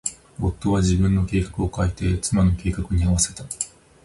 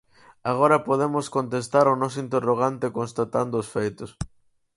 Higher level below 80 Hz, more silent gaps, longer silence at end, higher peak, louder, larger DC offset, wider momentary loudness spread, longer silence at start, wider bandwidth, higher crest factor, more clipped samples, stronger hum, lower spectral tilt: first, -30 dBFS vs -54 dBFS; neither; second, 0.35 s vs 0.5 s; about the same, -6 dBFS vs -4 dBFS; about the same, -22 LUFS vs -24 LUFS; neither; second, 10 LU vs 13 LU; second, 0.05 s vs 0.45 s; about the same, 11.5 kHz vs 11.5 kHz; about the same, 16 dB vs 20 dB; neither; neither; about the same, -5.5 dB/octave vs -6.5 dB/octave